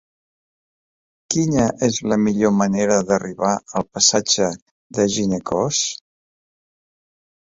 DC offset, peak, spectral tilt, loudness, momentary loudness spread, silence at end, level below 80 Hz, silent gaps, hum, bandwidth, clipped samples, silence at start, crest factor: under 0.1%; -2 dBFS; -4 dB/octave; -19 LUFS; 8 LU; 1.45 s; -52 dBFS; 4.62-4.90 s; none; 8 kHz; under 0.1%; 1.3 s; 20 dB